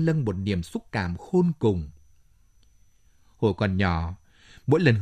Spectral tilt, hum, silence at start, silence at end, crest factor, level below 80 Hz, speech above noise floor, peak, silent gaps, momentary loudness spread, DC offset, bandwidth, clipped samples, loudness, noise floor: -8 dB/octave; none; 0 s; 0 s; 20 dB; -50 dBFS; 34 dB; -6 dBFS; none; 13 LU; under 0.1%; 10.5 kHz; under 0.1%; -26 LUFS; -58 dBFS